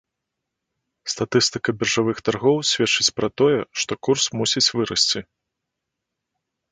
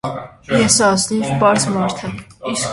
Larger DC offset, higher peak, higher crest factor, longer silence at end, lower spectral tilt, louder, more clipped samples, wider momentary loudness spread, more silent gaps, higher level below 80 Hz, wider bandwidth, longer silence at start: neither; about the same, -2 dBFS vs 0 dBFS; about the same, 20 dB vs 16 dB; first, 1.5 s vs 0 s; about the same, -3 dB/octave vs -3.5 dB/octave; second, -20 LUFS vs -15 LUFS; neither; second, 7 LU vs 16 LU; neither; second, -58 dBFS vs -46 dBFS; second, 9.6 kHz vs 11.5 kHz; first, 1.05 s vs 0.05 s